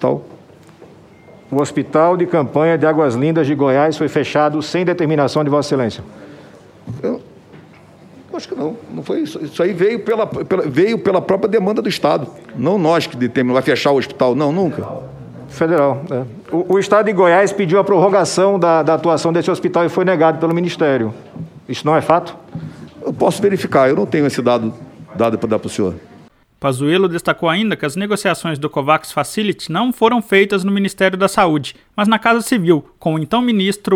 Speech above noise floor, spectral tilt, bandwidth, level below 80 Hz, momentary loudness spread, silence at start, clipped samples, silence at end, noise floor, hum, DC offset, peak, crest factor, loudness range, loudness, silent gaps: 30 dB; -6 dB/octave; 16.5 kHz; -56 dBFS; 12 LU; 0 s; under 0.1%; 0 s; -45 dBFS; none; under 0.1%; 0 dBFS; 16 dB; 6 LU; -16 LUFS; none